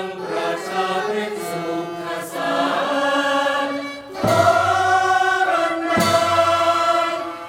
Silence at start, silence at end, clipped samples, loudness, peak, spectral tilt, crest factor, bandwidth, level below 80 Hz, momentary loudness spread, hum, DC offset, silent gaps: 0 s; 0 s; under 0.1%; -19 LUFS; -4 dBFS; -4 dB/octave; 16 dB; 16.5 kHz; -58 dBFS; 10 LU; none; under 0.1%; none